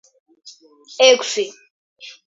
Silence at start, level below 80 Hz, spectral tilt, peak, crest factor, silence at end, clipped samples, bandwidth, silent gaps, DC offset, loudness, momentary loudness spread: 0.45 s; -82 dBFS; 0.5 dB/octave; 0 dBFS; 20 dB; 0.15 s; under 0.1%; 7.8 kHz; 1.70-1.96 s; under 0.1%; -16 LUFS; 25 LU